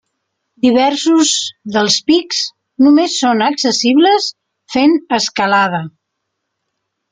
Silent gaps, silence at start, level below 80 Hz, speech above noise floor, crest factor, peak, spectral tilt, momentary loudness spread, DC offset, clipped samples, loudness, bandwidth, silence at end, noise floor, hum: none; 0.65 s; -58 dBFS; 61 dB; 14 dB; 0 dBFS; -3 dB/octave; 8 LU; under 0.1%; under 0.1%; -13 LUFS; 9.6 kHz; 1.2 s; -74 dBFS; none